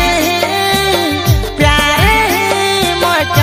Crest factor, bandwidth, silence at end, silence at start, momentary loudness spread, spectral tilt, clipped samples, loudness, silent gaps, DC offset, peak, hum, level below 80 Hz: 12 dB; 16.5 kHz; 0 s; 0 s; 3 LU; -4 dB/octave; 0.1%; -11 LUFS; none; under 0.1%; 0 dBFS; none; -22 dBFS